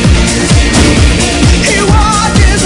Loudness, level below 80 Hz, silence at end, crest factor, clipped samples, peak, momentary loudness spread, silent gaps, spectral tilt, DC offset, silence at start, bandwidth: -8 LUFS; -12 dBFS; 0 s; 6 dB; 1%; 0 dBFS; 2 LU; none; -4.5 dB/octave; under 0.1%; 0 s; 12 kHz